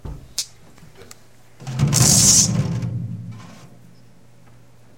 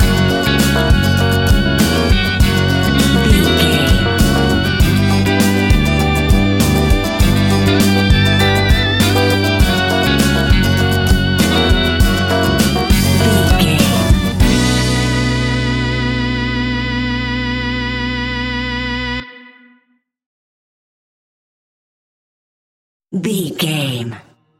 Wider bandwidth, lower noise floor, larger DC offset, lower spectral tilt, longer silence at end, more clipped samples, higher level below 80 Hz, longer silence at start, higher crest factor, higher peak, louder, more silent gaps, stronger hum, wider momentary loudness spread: about the same, 16.5 kHz vs 17 kHz; second, -50 dBFS vs -60 dBFS; first, 0.5% vs under 0.1%; second, -3 dB/octave vs -5 dB/octave; first, 1.3 s vs 0.4 s; neither; second, -42 dBFS vs -20 dBFS; about the same, 0.05 s vs 0 s; first, 20 dB vs 14 dB; about the same, -2 dBFS vs 0 dBFS; about the same, -16 LUFS vs -14 LUFS; second, none vs 20.26-23.00 s; neither; first, 23 LU vs 7 LU